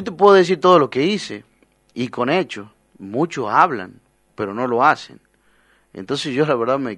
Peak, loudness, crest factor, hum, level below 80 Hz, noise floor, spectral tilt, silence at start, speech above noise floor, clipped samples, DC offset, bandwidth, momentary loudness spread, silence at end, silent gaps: 0 dBFS; -18 LUFS; 18 dB; none; -62 dBFS; -58 dBFS; -5.5 dB/octave; 0 s; 40 dB; under 0.1%; under 0.1%; 10.5 kHz; 18 LU; 0 s; none